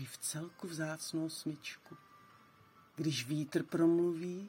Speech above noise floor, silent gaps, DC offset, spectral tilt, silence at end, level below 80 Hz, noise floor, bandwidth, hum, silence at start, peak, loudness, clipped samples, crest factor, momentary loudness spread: 27 dB; none; under 0.1%; -5 dB/octave; 0 s; -84 dBFS; -64 dBFS; 16.5 kHz; none; 0 s; -20 dBFS; -37 LUFS; under 0.1%; 18 dB; 20 LU